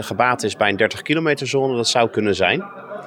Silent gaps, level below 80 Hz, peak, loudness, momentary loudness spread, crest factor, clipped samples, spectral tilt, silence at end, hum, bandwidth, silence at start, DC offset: none; -64 dBFS; -2 dBFS; -19 LUFS; 3 LU; 18 dB; under 0.1%; -4 dB/octave; 0 s; none; 17.5 kHz; 0 s; under 0.1%